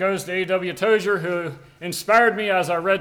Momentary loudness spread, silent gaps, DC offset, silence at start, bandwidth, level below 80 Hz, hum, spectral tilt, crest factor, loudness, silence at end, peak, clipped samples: 12 LU; none; under 0.1%; 0 s; 20 kHz; -62 dBFS; none; -4.5 dB/octave; 16 dB; -21 LUFS; 0 s; -6 dBFS; under 0.1%